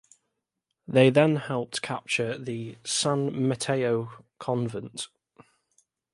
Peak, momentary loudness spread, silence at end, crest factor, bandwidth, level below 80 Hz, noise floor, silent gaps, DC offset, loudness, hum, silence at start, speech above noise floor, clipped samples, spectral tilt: -4 dBFS; 16 LU; 1.05 s; 22 dB; 11.5 kHz; -68 dBFS; -82 dBFS; none; under 0.1%; -26 LUFS; none; 0.9 s; 56 dB; under 0.1%; -5 dB/octave